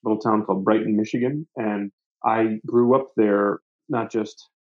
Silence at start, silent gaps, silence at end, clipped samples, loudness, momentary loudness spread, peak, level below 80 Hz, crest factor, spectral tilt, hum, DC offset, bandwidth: 0.05 s; 1.93-1.98 s, 2.06-2.15 s, 3.62-3.79 s; 0.3 s; under 0.1%; -22 LUFS; 9 LU; -4 dBFS; -76 dBFS; 18 dB; -8 dB/octave; none; under 0.1%; 7.4 kHz